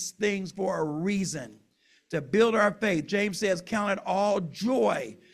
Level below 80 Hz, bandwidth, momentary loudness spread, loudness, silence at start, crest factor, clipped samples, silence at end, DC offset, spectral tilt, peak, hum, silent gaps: -66 dBFS; 14 kHz; 10 LU; -27 LUFS; 0 s; 18 dB; under 0.1%; 0.2 s; under 0.1%; -5 dB/octave; -10 dBFS; none; none